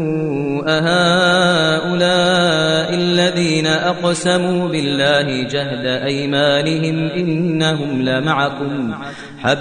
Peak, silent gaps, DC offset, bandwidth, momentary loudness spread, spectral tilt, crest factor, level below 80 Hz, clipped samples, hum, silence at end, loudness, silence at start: 0 dBFS; none; 0.2%; 10 kHz; 7 LU; -5 dB/octave; 16 dB; -52 dBFS; under 0.1%; none; 0 s; -16 LUFS; 0 s